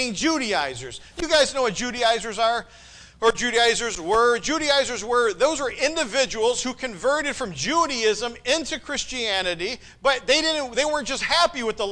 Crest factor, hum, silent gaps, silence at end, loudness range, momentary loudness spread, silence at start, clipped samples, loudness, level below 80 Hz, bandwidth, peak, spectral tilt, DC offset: 16 dB; none; none; 0 s; 3 LU; 8 LU; 0 s; under 0.1%; -22 LUFS; -48 dBFS; 10.5 kHz; -8 dBFS; -2 dB/octave; under 0.1%